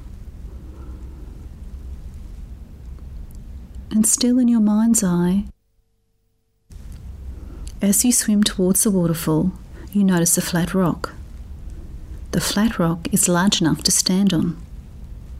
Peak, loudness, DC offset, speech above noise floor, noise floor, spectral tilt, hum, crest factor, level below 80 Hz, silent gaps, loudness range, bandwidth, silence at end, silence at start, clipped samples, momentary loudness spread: -4 dBFS; -18 LUFS; under 0.1%; 49 dB; -66 dBFS; -4 dB/octave; none; 18 dB; -36 dBFS; none; 7 LU; 16 kHz; 0 s; 0 s; under 0.1%; 23 LU